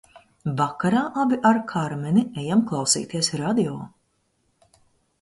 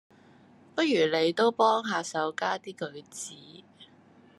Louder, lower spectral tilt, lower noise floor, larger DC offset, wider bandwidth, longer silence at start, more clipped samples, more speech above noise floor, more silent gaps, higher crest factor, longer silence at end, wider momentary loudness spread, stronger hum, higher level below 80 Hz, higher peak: first, -23 LUFS vs -27 LUFS; about the same, -4.5 dB/octave vs -3.5 dB/octave; first, -69 dBFS vs -57 dBFS; neither; about the same, 11.5 kHz vs 12.5 kHz; second, 0.15 s vs 0.75 s; neither; first, 47 dB vs 30 dB; neither; about the same, 20 dB vs 18 dB; first, 1.35 s vs 0.55 s; second, 9 LU vs 16 LU; neither; first, -62 dBFS vs -84 dBFS; first, -4 dBFS vs -10 dBFS